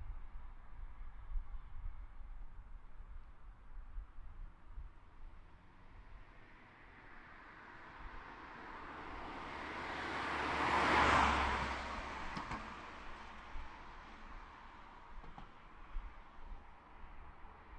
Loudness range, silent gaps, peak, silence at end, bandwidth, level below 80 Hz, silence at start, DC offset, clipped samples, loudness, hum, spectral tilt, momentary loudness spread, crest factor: 23 LU; none; -18 dBFS; 0 s; 11.5 kHz; -50 dBFS; 0 s; under 0.1%; under 0.1%; -39 LUFS; none; -4.5 dB/octave; 25 LU; 24 dB